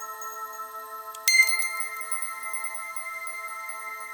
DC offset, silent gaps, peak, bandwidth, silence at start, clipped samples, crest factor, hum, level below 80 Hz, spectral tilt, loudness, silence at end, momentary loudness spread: under 0.1%; none; -2 dBFS; 19 kHz; 0 s; under 0.1%; 28 dB; none; -84 dBFS; 4.5 dB/octave; -26 LUFS; 0 s; 18 LU